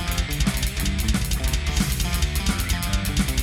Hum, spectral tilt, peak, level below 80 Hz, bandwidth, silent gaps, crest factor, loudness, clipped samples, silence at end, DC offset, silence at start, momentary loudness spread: none; -4 dB/octave; -8 dBFS; -26 dBFS; 17 kHz; none; 14 dB; -24 LUFS; under 0.1%; 0 s; under 0.1%; 0 s; 1 LU